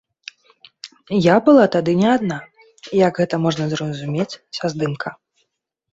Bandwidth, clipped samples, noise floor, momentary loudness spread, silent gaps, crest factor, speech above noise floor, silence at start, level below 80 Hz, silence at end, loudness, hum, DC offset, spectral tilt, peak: 8 kHz; under 0.1%; -75 dBFS; 25 LU; none; 18 dB; 58 dB; 0.85 s; -58 dBFS; 0.8 s; -18 LUFS; none; under 0.1%; -6.5 dB/octave; -2 dBFS